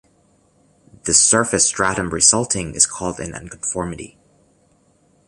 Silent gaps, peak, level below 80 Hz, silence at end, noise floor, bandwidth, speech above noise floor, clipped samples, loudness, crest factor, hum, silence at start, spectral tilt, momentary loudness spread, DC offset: none; 0 dBFS; -46 dBFS; 1.2 s; -58 dBFS; 14.5 kHz; 39 dB; under 0.1%; -16 LUFS; 20 dB; 50 Hz at -55 dBFS; 1.05 s; -2 dB/octave; 17 LU; under 0.1%